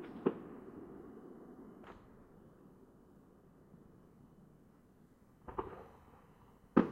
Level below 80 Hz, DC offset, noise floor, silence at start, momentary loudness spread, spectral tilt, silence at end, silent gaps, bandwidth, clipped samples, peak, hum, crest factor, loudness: -68 dBFS; under 0.1%; -65 dBFS; 0 s; 25 LU; -9 dB/octave; 0 s; none; 6.4 kHz; under 0.1%; -12 dBFS; none; 32 dB; -43 LUFS